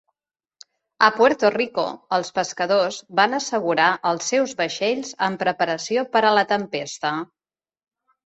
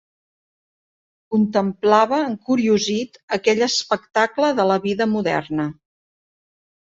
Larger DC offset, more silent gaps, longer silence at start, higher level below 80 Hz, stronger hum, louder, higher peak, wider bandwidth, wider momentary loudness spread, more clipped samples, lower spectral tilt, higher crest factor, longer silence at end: neither; second, none vs 3.23-3.28 s; second, 1 s vs 1.3 s; second, -68 dBFS vs -62 dBFS; neither; about the same, -21 LUFS vs -20 LUFS; about the same, -2 dBFS vs -2 dBFS; about the same, 8.2 kHz vs 7.8 kHz; about the same, 8 LU vs 8 LU; neither; second, -3 dB/octave vs -4.5 dB/octave; about the same, 20 dB vs 18 dB; about the same, 1.15 s vs 1.15 s